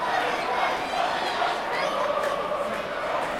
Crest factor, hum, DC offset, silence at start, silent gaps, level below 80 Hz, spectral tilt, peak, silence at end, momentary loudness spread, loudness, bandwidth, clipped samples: 14 dB; none; under 0.1%; 0 s; none; -58 dBFS; -3 dB/octave; -12 dBFS; 0 s; 3 LU; -26 LUFS; 16.5 kHz; under 0.1%